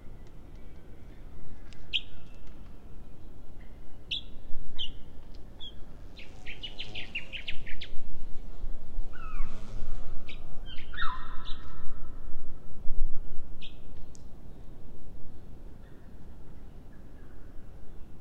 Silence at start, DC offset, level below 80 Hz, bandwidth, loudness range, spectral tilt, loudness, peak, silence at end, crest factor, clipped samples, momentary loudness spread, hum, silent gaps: 0.05 s; under 0.1%; -36 dBFS; 4.3 kHz; 11 LU; -4.5 dB/octave; -43 LUFS; -8 dBFS; 0 s; 16 dB; under 0.1%; 16 LU; none; none